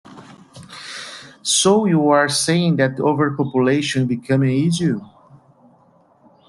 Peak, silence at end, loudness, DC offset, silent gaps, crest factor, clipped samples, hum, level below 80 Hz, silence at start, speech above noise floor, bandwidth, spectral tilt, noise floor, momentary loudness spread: -2 dBFS; 1.45 s; -17 LUFS; under 0.1%; none; 16 dB; under 0.1%; none; -58 dBFS; 0.1 s; 37 dB; 12.5 kHz; -4.5 dB/octave; -54 dBFS; 17 LU